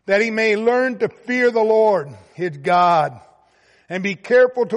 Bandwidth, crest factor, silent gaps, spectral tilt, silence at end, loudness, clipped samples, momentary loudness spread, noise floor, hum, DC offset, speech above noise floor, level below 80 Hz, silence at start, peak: 10.5 kHz; 14 dB; none; -5.5 dB/octave; 0 s; -18 LUFS; under 0.1%; 11 LU; -56 dBFS; none; under 0.1%; 39 dB; -66 dBFS; 0.1 s; -4 dBFS